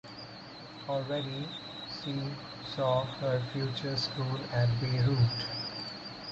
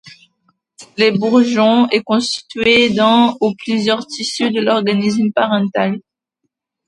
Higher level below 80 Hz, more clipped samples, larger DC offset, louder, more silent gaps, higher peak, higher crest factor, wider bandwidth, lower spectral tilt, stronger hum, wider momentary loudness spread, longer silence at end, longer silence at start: about the same, -58 dBFS vs -56 dBFS; neither; neither; second, -33 LUFS vs -14 LUFS; neither; second, -16 dBFS vs 0 dBFS; about the same, 18 dB vs 16 dB; second, 7.8 kHz vs 11 kHz; first, -6.5 dB/octave vs -4.5 dB/octave; neither; first, 13 LU vs 8 LU; second, 0 s vs 0.9 s; about the same, 0.05 s vs 0.05 s